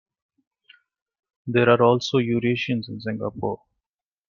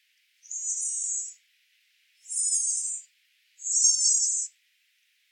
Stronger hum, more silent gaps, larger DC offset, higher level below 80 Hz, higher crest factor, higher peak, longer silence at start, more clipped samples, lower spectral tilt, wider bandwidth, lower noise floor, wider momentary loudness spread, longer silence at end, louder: neither; neither; neither; first, -62 dBFS vs under -90 dBFS; about the same, 20 dB vs 20 dB; first, -4 dBFS vs -10 dBFS; first, 1.45 s vs 0.5 s; neither; first, -6.5 dB/octave vs 12.5 dB/octave; second, 7.2 kHz vs 16 kHz; first, under -90 dBFS vs -69 dBFS; second, 13 LU vs 16 LU; about the same, 0.75 s vs 0.85 s; about the same, -22 LUFS vs -24 LUFS